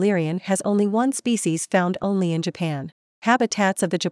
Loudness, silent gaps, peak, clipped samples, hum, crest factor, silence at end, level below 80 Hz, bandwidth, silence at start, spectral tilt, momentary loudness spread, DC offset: -22 LUFS; 2.92-3.22 s; -4 dBFS; under 0.1%; none; 16 dB; 0 s; -68 dBFS; 12 kHz; 0 s; -5 dB/octave; 7 LU; under 0.1%